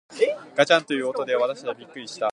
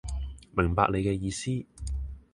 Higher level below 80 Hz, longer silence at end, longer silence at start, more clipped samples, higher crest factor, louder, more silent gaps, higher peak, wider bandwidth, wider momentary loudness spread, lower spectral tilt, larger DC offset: second, -78 dBFS vs -38 dBFS; second, 0 s vs 0.15 s; about the same, 0.1 s vs 0.05 s; neither; about the same, 22 dB vs 22 dB; first, -23 LUFS vs -30 LUFS; neither; first, -2 dBFS vs -8 dBFS; about the same, 11 kHz vs 11 kHz; about the same, 14 LU vs 12 LU; second, -3.5 dB/octave vs -6 dB/octave; neither